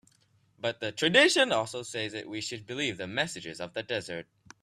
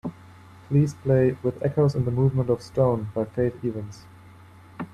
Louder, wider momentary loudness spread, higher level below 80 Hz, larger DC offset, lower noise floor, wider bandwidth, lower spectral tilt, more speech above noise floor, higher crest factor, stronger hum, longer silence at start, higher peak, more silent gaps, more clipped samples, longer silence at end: second, -29 LUFS vs -24 LUFS; first, 16 LU vs 12 LU; second, -70 dBFS vs -52 dBFS; neither; first, -67 dBFS vs -48 dBFS; first, 14.5 kHz vs 9.4 kHz; second, -3 dB/octave vs -9 dB/octave; first, 38 dB vs 25 dB; first, 22 dB vs 16 dB; neither; first, 0.6 s vs 0.05 s; about the same, -8 dBFS vs -8 dBFS; neither; neither; first, 0.4 s vs 0.05 s